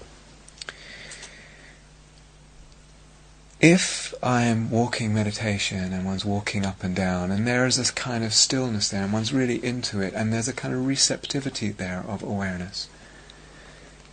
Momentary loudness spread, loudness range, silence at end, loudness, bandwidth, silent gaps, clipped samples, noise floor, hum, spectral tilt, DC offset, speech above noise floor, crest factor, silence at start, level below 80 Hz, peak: 18 LU; 5 LU; 0 s; -24 LUFS; 9.6 kHz; none; under 0.1%; -50 dBFS; none; -4 dB/octave; under 0.1%; 26 dB; 24 dB; 0 s; -52 dBFS; -2 dBFS